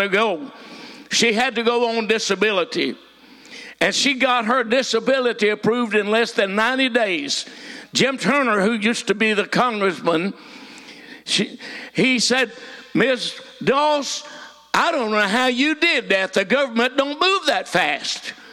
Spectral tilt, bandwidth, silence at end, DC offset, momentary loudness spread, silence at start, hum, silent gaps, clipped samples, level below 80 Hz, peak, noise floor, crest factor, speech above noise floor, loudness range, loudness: -3 dB/octave; 16.5 kHz; 0 s; under 0.1%; 18 LU; 0 s; none; none; under 0.1%; -66 dBFS; -6 dBFS; -45 dBFS; 16 dB; 25 dB; 3 LU; -19 LUFS